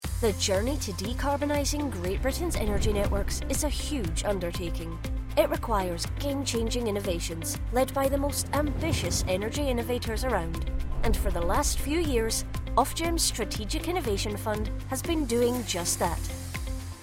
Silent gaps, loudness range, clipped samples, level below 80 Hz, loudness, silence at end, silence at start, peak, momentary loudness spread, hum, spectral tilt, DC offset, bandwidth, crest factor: none; 2 LU; under 0.1%; -34 dBFS; -29 LUFS; 0 s; 0 s; -10 dBFS; 6 LU; none; -4.5 dB/octave; under 0.1%; 16.5 kHz; 18 dB